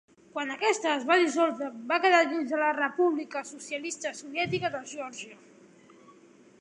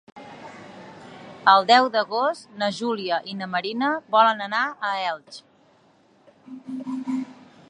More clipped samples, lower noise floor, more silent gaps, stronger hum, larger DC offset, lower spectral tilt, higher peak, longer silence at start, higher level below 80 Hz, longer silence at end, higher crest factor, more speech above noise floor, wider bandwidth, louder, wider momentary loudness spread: neither; about the same, -56 dBFS vs -58 dBFS; neither; neither; neither; about the same, -3.5 dB/octave vs -4 dB/octave; second, -10 dBFS vs -2 dBFS; first, 0.35 s vs 0.15 s; about the same, -74 dBFS vs -78 dBFS; first, 1.25 s vs 0.4 s; about the same, 20 dB vs 22 dB; second, 28 dB vs 36 dB; about the same, 11 kHz vs 10.5 kHz; second, -28 LUFS vs -22 LUFS; second, 15 LU vs 25 LU